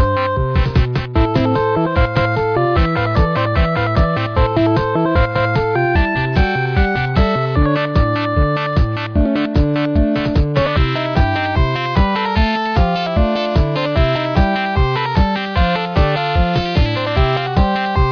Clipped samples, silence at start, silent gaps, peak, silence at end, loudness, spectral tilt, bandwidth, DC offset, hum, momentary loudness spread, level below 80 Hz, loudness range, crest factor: under 0.1%; 0 s; none; -2 dBFS; 0 s; -16 LUFS; -8 dB/octave; 5.4 kHz; under 0.1%; none; 1 LU; -20 dBFS; 1 LU; 12 dB